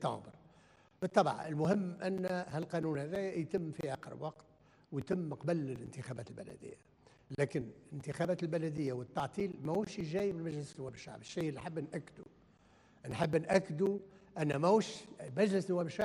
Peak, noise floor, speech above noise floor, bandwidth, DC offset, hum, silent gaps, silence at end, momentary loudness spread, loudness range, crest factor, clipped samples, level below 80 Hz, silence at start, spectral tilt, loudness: -14 dBFS; -66 dBFS; 29 dB; 12 kHz; under 0.1%; none; none; 0 s; 15 LU; 6 LU; 24 dB; under 0.1%; -70 dBFS; 0 s; -6.5 dB/octave; -37 LUFS